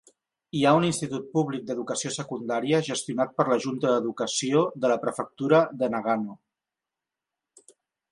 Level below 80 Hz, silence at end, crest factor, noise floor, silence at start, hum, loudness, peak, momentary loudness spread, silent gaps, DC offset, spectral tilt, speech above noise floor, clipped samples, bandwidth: -70 dBFS; 1.75 s; 20 dB; -88 dBFS; 0.55 s; none; -26 LUFS; -6 dBFS; 9 LU; none; under 0.1%; -5 dB/octave; 63 dB; under 0.1%; 11.5 kHz